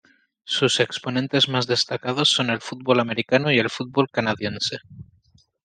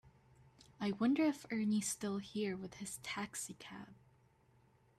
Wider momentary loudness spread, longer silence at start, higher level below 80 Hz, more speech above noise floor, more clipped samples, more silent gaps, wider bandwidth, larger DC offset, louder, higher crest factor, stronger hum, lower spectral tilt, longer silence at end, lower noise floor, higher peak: second, 7 LU vs 16 LU; first, 0.45 s vs 0.05 s; first, -64 dBFS vs -76 dBFS; first, 37 dB vs 31 dB; neither; neither; second, 10 kHz vs 14 kHz; neither; first, -21 LUFS vs -39 LUFS; about the same, 20 dB vs 16 dB; neither; about the same, -4 dB/octave vs -4.5 dB/octave; second, 0.6 s vs 1.05 s; second, -60 dBFS vs -70 dBFS; first, -4 dBFS vs -24 dBFS